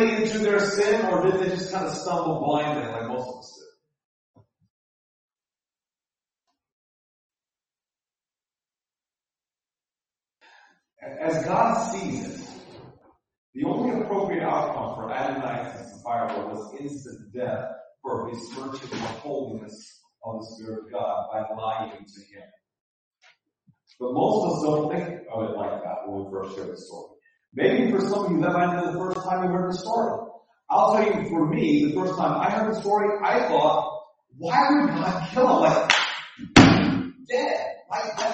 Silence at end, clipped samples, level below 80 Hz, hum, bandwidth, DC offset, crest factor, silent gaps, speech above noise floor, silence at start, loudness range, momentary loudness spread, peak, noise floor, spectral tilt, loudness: 0 s; under 0.1%; -56 dBFS; none; 8.4 kHz; under 0.1%; 26 dB; 4.05-4.34 s, 4.70-5.29 s, 6.72-7.30 s, 13.38-13.53 s, 22.81-23.11 s; over 65 dB; 0 s; 13 LU; 17 LU; 0 dBFS; under -90 dBFS; -5.5 dB/octave; -24 LUFS